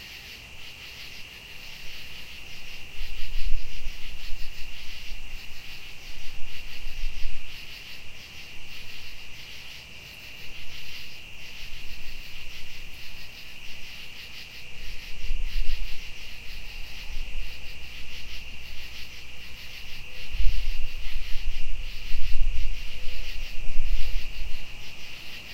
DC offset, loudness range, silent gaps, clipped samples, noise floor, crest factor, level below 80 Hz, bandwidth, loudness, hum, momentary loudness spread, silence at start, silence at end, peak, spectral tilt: under 0.1%; 5 LU; none; under 0.1%; -43 dBFS; 18 dB; -32 dBFS; 7 kHz; -39 LUFS; none; 7 LU; 0 s; 0 s; -4 dBFS; -3 dB/octave